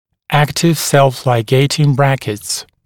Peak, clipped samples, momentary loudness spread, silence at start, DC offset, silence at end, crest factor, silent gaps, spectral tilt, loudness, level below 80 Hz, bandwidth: 0 dBFS; under 0.1%; 8 LU; 0.3 s; 0.7%; 0.2 s; 14 dB; none; -5 dB/octave; -14 LUFS; -48 dBFS; 18.5 kHz